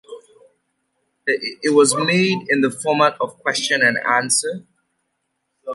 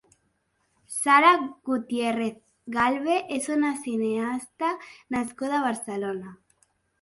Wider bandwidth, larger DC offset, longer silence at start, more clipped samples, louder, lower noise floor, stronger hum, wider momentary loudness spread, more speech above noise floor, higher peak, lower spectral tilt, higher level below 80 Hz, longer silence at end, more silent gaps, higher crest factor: about the same, 11.5 kHz vs 12 kHz; neither; second, 0.1 s vs 0.9 s; neither; first, -18 LUFS vs -25 LUFS; about the same, -73 dBFS vs -72 dBFS; neither; second, 9 LU vs 13 LU; first, 55 dB vs 47 dB; first, -2 dBFS vs -6 dBFS; about the same, -3 dB/octave vs -3.5 dB/octave; about the same, -68 dBFS vs -66 dBFS; second, 0 s vs 0.65 s; neither; about the same, 18 dB vs 20 dB